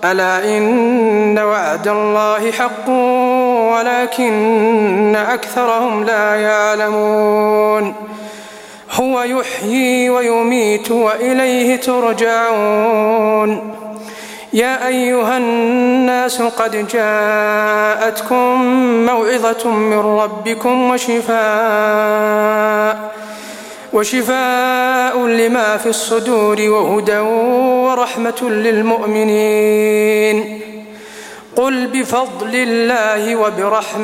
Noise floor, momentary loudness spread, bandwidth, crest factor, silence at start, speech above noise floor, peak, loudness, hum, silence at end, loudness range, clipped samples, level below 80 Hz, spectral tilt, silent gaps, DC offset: -34 dBFS; 6 LU; 16.5 kHz; 12 dB; 0 s; 21 dB; 0 dBFS; -14 LUFS; none; 0 s; 2 LU; under 0.1%; -62 dBFS; -4 dB/octave; none; under 0.1%